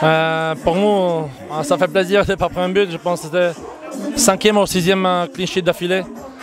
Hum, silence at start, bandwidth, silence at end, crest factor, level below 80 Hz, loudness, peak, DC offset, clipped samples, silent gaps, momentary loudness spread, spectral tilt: none; 0 s; 16 kHz; 0 s; 16 dB; -44 dBFS; -17 LUFS; 0 dBFS; under 0.1%; under 0.1%; none; 9 LU; -4 dB/octave